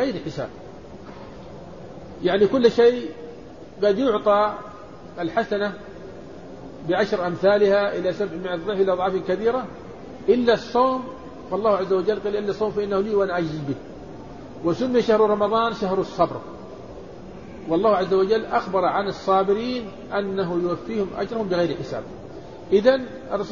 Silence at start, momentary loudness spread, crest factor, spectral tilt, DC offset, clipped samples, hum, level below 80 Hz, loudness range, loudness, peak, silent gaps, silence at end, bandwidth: 0 s; 21 LU; 20 dB; -6.5 dB/octave; 0.4%; under 0.1%; none; -52 dBFS; 3 LU; -22 LUFS; -4 dBFS; none; 0 s; 7.2 kHz